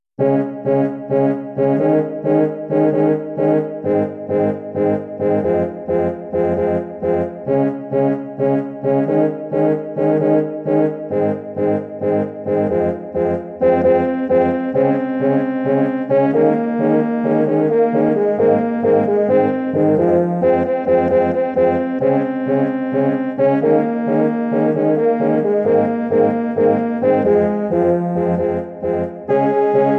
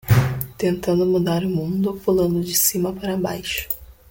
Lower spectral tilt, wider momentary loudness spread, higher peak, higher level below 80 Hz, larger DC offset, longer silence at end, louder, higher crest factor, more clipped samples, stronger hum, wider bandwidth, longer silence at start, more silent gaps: first, -10.5 dB/octave vs -5 dB/octave; second, 5 LU vs 8 LU; about the same, -2 dBFS vs -2 dBFS; about the same, -46 dBFS vs -44 dBFS; neither; second, 0 s vs 0.2 s; first, -17 LUFS vs -21 LUFS; about the same, 14 dB vs 18 dB; neither; neither; second, 4.4 kHz vs 17 kHz; first, 0.2 s vs 0.05 s; neither